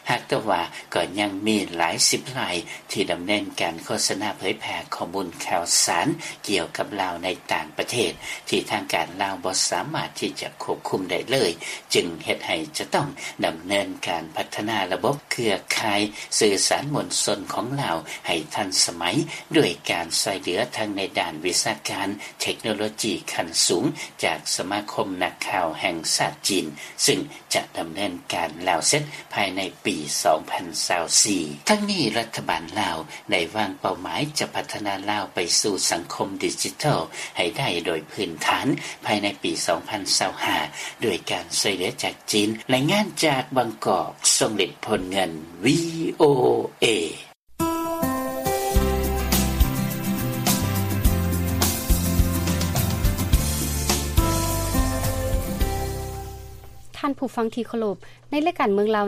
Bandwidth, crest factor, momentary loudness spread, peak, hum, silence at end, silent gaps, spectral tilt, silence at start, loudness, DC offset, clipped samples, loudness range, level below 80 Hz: 15.5 kHz; 20 dB; 8 LU; -4 dBFS; none; 0 s; none; -3.5 dB/octave; 0.05 s; -23 LUFS; under 0.1%; under 0.1%; 4 LU; -36 dBFS